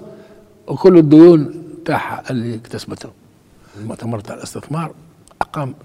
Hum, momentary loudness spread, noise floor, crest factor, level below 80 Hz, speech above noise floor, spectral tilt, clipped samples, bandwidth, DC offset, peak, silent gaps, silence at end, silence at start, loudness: none; 23 LU; -48 dBFS; 16 dB; -52 dBFS; 34 dB; -8 dB/octave; 0.1%; 12 kHz; under 0.1%; 0 dBFS; none; 0.1 s; 0.05 s; -14 LUFS